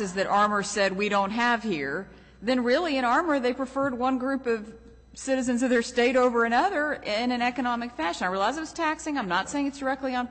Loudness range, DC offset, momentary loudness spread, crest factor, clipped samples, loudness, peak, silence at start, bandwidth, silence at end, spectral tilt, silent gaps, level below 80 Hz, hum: 2 LU; under 0.1%; 7 LU; 14 dB; under 0.1%; -26 LUFS; -12 dBFS; 0 s; 8.4 kHz; 0 s; -4 dB/octave; none; -56 dBFS; none